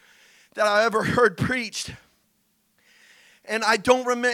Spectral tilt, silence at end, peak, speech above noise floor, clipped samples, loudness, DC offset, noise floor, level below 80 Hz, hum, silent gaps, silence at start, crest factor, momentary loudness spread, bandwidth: -4 dB/octave; 0 s; -2 dBFS; 46 dB; under 0.1%; -22 LUFS; under 0.1%; -68 dBFS; -56 dBFS; none; none; 0.55 s; 22 dB; 12 LU; 16 kHz